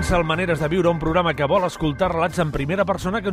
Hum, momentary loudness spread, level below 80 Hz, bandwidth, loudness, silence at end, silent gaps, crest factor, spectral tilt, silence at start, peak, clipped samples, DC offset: none; 3 LU; -36 dBFS; 15 kHz; -21 LUFS; 0 s; none; 14 dB; -6 dB/octave; 0 s; -6 dBFS; under 0.1%; under 0.1%